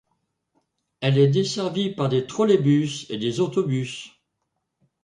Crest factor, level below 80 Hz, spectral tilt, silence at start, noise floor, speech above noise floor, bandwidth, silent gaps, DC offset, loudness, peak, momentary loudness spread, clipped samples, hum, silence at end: 18 dB; -64 dBFS; -6.5 dB/octave; 1 s; -78 dBFS; 56 dB; 10.5 kHz; none; under 0.1%; -22 LUFS; -6 dBFS; 9 LU; under 0.1%; none; 0.95 s